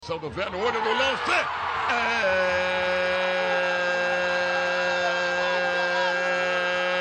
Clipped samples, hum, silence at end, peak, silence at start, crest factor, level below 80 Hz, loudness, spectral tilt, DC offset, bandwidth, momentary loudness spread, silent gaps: under 0.1%; none; 0 s; -8 dBFS; 0 s; 16 dB; -58 dBFS; -24 LUFS; -3 dB/octave; under 0.1%; 9.4 kHz; 3 LU; none